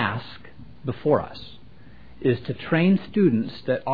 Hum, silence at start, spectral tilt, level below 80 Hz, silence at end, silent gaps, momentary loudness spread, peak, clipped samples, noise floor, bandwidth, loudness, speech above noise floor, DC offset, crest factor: none; 0 s; -10 dB/octave; -54 dBFS; 0 s; none; 21 LU; -6 dBFS; under 0.1%; -49 dBFS; 5 kHz; -24 LUFS; 26 dB; 0.7%; 18 dB